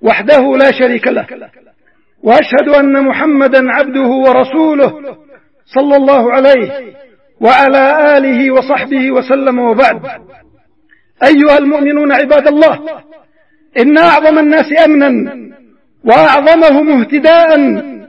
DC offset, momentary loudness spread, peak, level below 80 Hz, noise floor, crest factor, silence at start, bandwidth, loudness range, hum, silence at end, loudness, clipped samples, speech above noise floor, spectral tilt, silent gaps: 0.3%; 10 LU; 0 dBFS; -50 dBFS; -54 dBFS; 8 dB; 0 s; 7.2 kHz; 3 LU; none; 0.05 s; -8 LUFS; 0.7%; 46 dB; -6.5 dB/octave; none